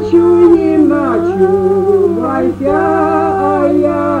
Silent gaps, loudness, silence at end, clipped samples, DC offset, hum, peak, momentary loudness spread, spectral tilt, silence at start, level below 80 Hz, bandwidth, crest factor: none; -11 LUFS; 0 s; under 0.1%; under 0.1%; none; 0 dBFS; 6 LU; -8.5 dB/octave; 0 s; -42 dBFS; 8.4 kHz; 10 dB